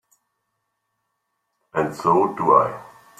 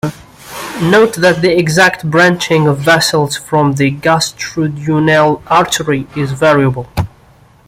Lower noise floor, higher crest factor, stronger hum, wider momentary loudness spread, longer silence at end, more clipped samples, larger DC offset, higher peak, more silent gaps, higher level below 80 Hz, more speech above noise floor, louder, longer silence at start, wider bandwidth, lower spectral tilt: first, -76 dBFS vs -44 dBFS; first, 22 dB vs 12 dB; neither; about the same, 11 LU vs 10 LU; second, 0.35 s vs 0.6 s; neither; neither; about the same, -2 dBFS vs 0 dBFS; neither; second, -62 dBFS vs -42 dBFS; first, 57 dB vs 33 dB; second, -20 LUFS vs -11 LUFS; first, 1.75 s vs 0.05 s; about the same, 15 kHz vs 16 kHz; first, -7 dB/octave vs -5 dB/octave